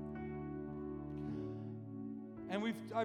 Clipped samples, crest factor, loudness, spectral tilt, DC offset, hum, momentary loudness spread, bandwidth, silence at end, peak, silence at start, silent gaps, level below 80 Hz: under 0.1%; 18 dB; -44 LUFS; -7.5 dB/octave; under 0.1%; none; 7 LU; 15 kHz; 0 s; -26 dBFS; 0 s; none; -64 dBFS